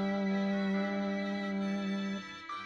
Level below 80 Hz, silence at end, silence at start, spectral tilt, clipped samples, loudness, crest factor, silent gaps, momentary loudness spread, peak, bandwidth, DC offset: -72 dBFS; 0 s; 0 s; -7 dB/octave; under 0.1%; -34 LUFS; 12 dB; none; 6 LU; -22 dBFS; 7.4 kHz; under 0.1%